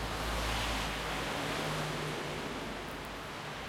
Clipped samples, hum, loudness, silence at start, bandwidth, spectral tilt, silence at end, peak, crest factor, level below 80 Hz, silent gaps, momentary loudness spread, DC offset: under 0.1%; none; -36 LUFS; 0 s; 16.5 kHz; -3.5 dB/octave; 0 s; -22 dBFS; 14 dB; -46 dBFS; none; 8 LU; under 0.1%